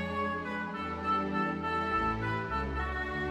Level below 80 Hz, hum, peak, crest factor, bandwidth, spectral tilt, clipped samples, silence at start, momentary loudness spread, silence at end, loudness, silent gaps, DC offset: -44 dBFS; none; -20 dBFS; 14 dB; 12.5 kHz; -7 dB/octave; under 0.1%; 0 s; 5 LU; 0 s; -33 LUFS; none; under 0.1%